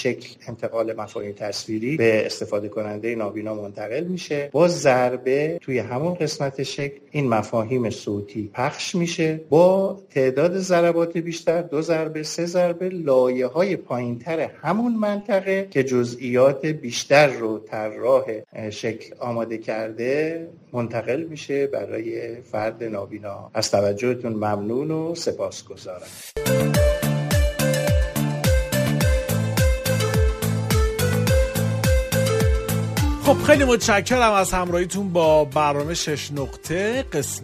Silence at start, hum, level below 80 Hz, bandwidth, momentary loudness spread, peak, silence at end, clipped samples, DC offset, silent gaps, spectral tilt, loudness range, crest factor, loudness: 0 s; none; -32 dBFS; 15.5 kHz; 12 LU; -2 dBFS; 0 s; under 0.1%; under 0.1%; none; -5.5 dB/octave; 6 LU; 20 dB; -22 LUFS